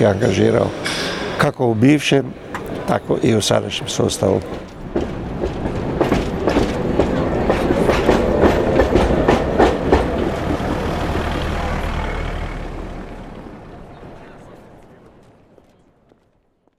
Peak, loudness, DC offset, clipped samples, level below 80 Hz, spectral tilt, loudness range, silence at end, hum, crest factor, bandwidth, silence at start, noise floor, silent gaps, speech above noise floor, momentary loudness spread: -2 dBFS; -18 LUFS; under 0.1%; under 0.1%; -30 dBFS; -5.5 dB/octave; 13 LU; 1.95 s; none; 18 dB; 16 kHz; 0 s; -61 dBFS; none; 44 dB; 16 LU